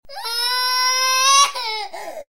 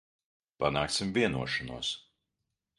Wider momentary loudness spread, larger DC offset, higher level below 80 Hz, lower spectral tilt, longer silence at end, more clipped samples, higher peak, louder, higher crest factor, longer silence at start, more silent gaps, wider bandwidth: first, 14 LU vs 7 LU; first, 1% vs under 0.1%; second, -62 dBFS vs -56 dBFS; second, 4 dB/octave vs -4 dB/octave; second, 0.1 s vs 0.8 s; neither; first, -2 dBFS vs -12 dBFS; first, -16 LUFS vs -31 LUFS; second, 16 dB vs 22 dB; second, 0 s vs 0.6 s; neither; first, 16.5 kHz vs 11.5 kHz